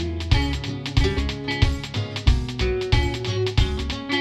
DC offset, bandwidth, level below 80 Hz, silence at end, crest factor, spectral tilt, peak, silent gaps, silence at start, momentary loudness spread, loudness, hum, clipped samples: under 0.1%; 12 kHz; -26 dBFS; 0 s; 18 dB; -5.5 dB/octave; -4 dBFS; none; 0 s; 4 LU; -24 LUFS; none; under 0.1%